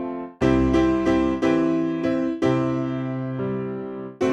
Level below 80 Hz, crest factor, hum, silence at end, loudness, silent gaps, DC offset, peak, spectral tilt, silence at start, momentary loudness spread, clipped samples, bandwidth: -40 dBFS; 14 dB; none; 0 s; -23 LUFS; none; under 0.1%; -8 dBFS; -7.5 dB/octave; 0 s; 9 LU; under 0.1%; 8.4 kHz